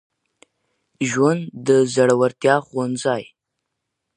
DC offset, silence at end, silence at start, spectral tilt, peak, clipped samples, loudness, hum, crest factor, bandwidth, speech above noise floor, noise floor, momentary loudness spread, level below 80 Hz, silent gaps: under 0.1%; 0.95 s; 1 s; -5.5 dB/octave; -2 dBFS; under 0.1%; -19 LUFS; none; 20 dB; 10 kHz; 61 dB; -79 dBFS; 8 LU; -68 dBFS; none